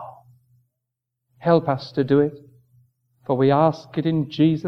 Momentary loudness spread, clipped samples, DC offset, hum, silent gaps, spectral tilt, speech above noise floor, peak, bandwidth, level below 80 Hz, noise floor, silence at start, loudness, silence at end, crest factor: 9 LU; under 0.1%; under 0.1%; none; none; -9 dB/octave; 62 dB; -4 dBFS; 6.4 kHz; -64 dBFS; -82 dBFS; 0 s; -21 LUFS; 0 s; 20 dB